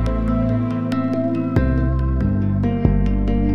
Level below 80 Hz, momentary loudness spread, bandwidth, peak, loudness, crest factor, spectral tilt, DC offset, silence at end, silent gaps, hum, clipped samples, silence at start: -24 dBFS; 2 LU; 6.2 kHz; -2 dBFS; -20 LUFS; 16 dB; -10 dB/octave; under 0.1%; 0 s; none; none; under 0.1%; 0 s